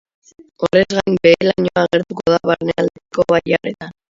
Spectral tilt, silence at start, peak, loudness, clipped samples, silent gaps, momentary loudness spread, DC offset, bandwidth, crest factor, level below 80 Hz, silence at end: -6 dB/octave; 0.6 s; 0 dBFS; -16 LUFS; under 0.1%; none; 8 LU; under 0.1%; 7.6 kHz; 16 dB; -50 dBFS; 0.2 s